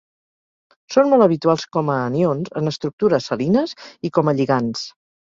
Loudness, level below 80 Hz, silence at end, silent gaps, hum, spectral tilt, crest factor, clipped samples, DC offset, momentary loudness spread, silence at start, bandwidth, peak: -19 LUFS; -60 dBFS; 0.35 s; 2.93-2.98 s; none; -6.5 dB/octave; 18 dB; under 0.1%; under 0.1%; 10 LU; 0.9 s; 7.6 kHz; -2 dBFS